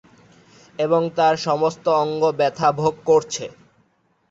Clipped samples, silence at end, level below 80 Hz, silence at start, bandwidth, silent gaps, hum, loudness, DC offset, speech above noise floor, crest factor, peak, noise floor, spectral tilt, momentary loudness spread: under 0.1%; 0.8 s; -62 dBFS; 0.8 s; 8 kHz; none; none; -20 LUFS; under 0.1%; 44 dB; 16 dB; -4 dBFS; -63 dBFS; -5 dB/octave; 11 LU